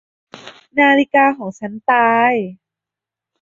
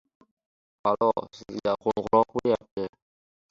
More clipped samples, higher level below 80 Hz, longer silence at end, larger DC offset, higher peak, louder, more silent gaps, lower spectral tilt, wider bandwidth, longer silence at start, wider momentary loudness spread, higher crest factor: neither; about the same, -64 dBFS vs -62 dBFS; first, 0.9 s vs 0.6 s; neither; first, -2 dBFS vs -8 dBFS; first, -15 LUFS vs -27 LUFS; second, none vs 2.71-2.77 s; second, -5.5 dB/octave vs -7 dB/octave; about the same, 7.4 kHz vs 7.6 kHz; second, 0.35 s vs 0.85 s; about the same, 14 LU vs 12 LU; about the same, 16 dB vs 20 dB